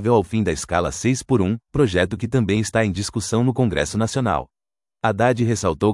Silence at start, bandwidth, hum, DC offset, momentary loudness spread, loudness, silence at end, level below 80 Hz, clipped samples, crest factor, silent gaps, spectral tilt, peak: 0 s; 12 kHz; none; under 0.1%; 4 LU; -21 LUFS; 0 s; -44 dBFS; under 0.1%; 16 dB; none; -5.5 dB/octave; -4 dBFS